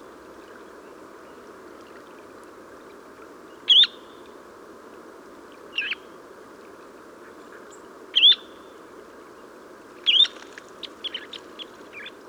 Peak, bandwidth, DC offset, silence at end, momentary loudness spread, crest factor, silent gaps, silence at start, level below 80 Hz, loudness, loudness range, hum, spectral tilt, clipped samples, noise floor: -6 dBFS; over 20 kHz; under 0.1%; 0.2 s; 30 LU; 22 dB; none; 3.65 s; -72 dBFS; -19 LUFS; 15 LU; none; -0.5 dB/octave; under 0.1%; -45 dBFS